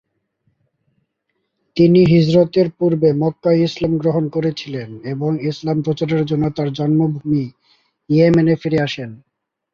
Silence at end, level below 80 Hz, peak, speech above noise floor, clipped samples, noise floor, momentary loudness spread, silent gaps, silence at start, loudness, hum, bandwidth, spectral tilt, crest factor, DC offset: 0.55 s; -52 dBFS; -2 dBFS; 56 dB; under 0.1%; -72 dBFS; 13 LU; none; 1.75 s; -17 LUFS; none; 7.2 kHz; -8.5 dB/octave; 16 dB; under 0.1%